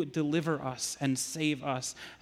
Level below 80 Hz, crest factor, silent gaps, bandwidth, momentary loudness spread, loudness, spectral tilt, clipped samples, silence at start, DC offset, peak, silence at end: -68 dBFS; 16 dB; none; 16 kHz; 4 LU; -32 LUFS; -4 dB/octave; under 0.1%; 0 s; under 0.1%; -18 dBFS; 0.05 s